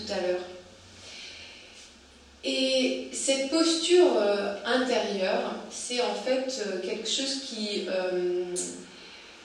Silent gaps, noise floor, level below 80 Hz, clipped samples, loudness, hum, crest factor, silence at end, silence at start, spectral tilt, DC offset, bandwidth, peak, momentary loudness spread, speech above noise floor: none; -53 dBFS; -66 dBFS; under 0.1%; -27 LUFS; none; 20 dB; 0 s; 0 s; -2.5 dB/octave; under 0.1%; 11.5 kHz; -10 dBFS; 21 LU; 26 dB